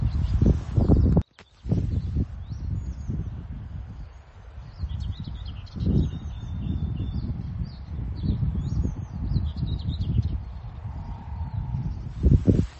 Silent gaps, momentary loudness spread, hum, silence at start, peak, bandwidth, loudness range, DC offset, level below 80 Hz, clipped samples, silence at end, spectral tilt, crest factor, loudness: none; 16 LU; none; 0 s; -4 dBFS; 7.2 kHz; 7 LU; under 0.1%; -30 dBFS; under 0.1%; 0 s; -9.5 dB/octave; 22 dB; -28 LUFS